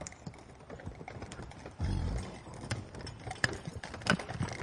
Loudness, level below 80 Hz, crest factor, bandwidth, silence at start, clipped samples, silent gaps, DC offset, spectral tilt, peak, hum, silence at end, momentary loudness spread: -38 LUFS; -48 dBFS; 28 dB; 11.5 kHz; 0 s; under 0.1%; none; under 0.1%; -4.5 dB/octave; -10 dBFS; none; 0 s; 15 LU